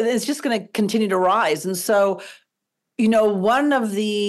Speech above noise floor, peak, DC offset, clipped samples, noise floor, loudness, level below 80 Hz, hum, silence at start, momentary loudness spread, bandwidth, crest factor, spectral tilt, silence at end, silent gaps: 61 dB; -10 dBFS; under 0.1%; under 0.1%; -80 dBFS; -20 LUFS; -66 dBFS; none; 0 s; 6 LU; 12.5 kHz; 10 dB; -4.5 dB/octave; 0 s; none